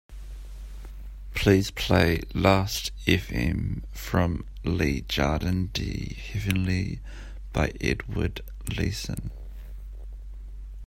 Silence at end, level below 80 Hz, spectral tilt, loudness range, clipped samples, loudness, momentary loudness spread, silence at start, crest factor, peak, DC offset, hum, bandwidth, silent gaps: 0 s; -36 dBFS; -5.5 dB/octave; 7 LU; under 0.1%; -27 LUFS; 21 LU; 0.1 s; 22 dB; -4 dBFS; under 0.1%; none; 16.5 kHz; none